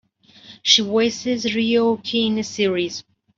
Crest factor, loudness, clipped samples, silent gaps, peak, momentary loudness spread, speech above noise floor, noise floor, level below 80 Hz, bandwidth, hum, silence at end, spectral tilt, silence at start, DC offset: 20 dB; -19 LUFS; under 0.1%; none; 0 dBFS; 10 LU; 28 dB; -47 dBFS; -64 dBFS; 7.6 kHz; none; 0.35 s; -3 dB/octave; 0.45 s; under 0.1%